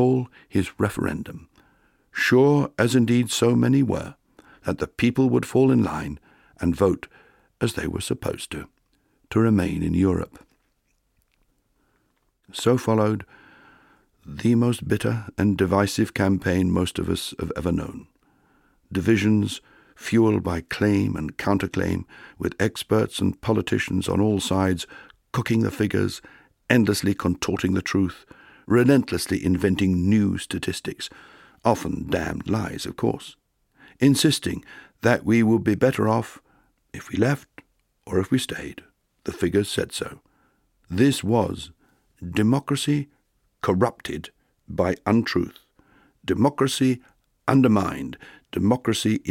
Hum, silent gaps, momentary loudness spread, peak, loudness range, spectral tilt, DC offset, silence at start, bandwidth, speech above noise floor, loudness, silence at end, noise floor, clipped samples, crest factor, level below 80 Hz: none; none; 15 LU; -2 dBFS; 5 LU; -6 dB/octave; under 0.1%; 0 s; 16.5 kHz; 47 dB; -23 LUFS; 0 s; -69 dBFS; under 0.1%; 22 dB; -48 dBFS